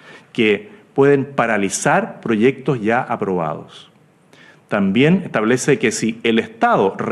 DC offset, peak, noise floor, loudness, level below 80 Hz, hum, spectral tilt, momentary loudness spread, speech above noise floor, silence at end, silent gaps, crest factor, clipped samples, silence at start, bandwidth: under 0.1%; -2 dBFS; -50 dBFS; -17 LUFS; -60 dBFS; none; -5 dB/octave; 8 LU; 33 dB; 0 s; none; 16 dB; under 0.1%; 0.05 s; 12.5 kHz